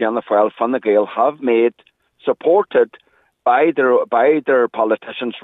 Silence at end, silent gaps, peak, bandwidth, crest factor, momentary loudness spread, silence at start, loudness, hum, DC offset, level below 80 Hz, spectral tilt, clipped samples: 0.05 s; none; -2 dBFS; 4 kHz; 14 dB; 7 LU; 0 s; -17 LUFS; none; under 0.1%; -76 dBFS; -7.5 dB/octave; under 0.1%